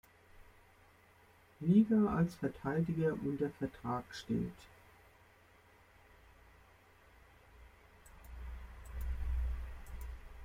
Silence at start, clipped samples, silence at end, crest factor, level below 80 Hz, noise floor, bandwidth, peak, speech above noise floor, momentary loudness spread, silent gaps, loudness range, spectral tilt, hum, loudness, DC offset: 0.35 s; under 0.1%; 0 s; 20 dB; -48 dBFS; -65 dBFS; 15.5 kHz; -18 dBFS; 31 dB; 20 LU; none; 19 LU; -8.5 dB/octave; none; -36 LUFS; under 0.1%